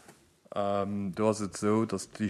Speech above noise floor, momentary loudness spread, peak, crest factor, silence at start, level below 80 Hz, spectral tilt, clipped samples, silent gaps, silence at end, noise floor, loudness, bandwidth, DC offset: 28 dB; 6 LU; -14 dBFS; 18 dB; 0.1 s; -68 dBFS; -6 dB/octave; under 0.1%; none; 0 s; -58 dBFS; -31 LUFS; 13 kHz; under 0.1%